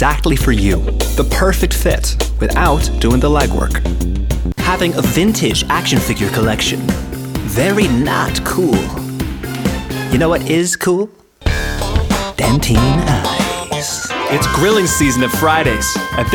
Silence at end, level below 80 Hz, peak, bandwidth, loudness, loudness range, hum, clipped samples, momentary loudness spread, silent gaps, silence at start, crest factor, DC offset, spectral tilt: 0 s; -20 dBFS; 0 dBFS; over 20 kHz; -15 LUFS; 2 LU; none; under 0.1%; 7 LU; none; 0 s; 14 dB; under 0.1%; -4.5 dB/octave